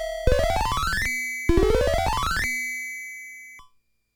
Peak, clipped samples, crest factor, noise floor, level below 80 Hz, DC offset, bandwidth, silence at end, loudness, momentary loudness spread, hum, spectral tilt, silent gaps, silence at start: -4 dBFS; under 0.1%; 20 dB; -62 dBFS; -30 dBFS; under 0.1%; 19 kHz; 0.55 s; -24 LUFS; 15 LU; none; -4.5 dB/octave; none; 0 s